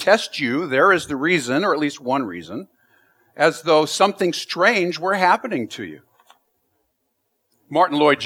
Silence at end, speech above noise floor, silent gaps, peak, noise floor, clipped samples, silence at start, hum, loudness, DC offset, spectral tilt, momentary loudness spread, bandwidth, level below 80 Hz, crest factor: 0 s; 53 dB; none; -2 dBFS; -72 dBFS; under 0.1%; 0 s; none; -19 LUFS; under 0.1%; -4 dB/octave; 13 LU; 16.5 kHz; -66 dBFS; 20 dB